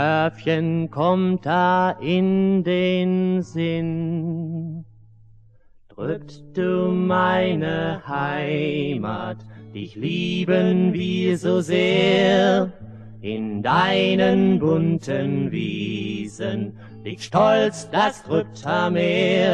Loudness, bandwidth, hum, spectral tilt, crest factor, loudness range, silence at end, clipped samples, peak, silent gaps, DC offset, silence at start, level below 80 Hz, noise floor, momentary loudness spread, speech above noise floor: -21 LUFS; 9.4 kHz; none; -6.5 dB/octave; 16 dB; 5 LU; 0 s; under 0.1%; -4 dBFS; none; under 0.1%; 0 s; -56 dBFS; -51 dBFS; 13 LU; 30 dB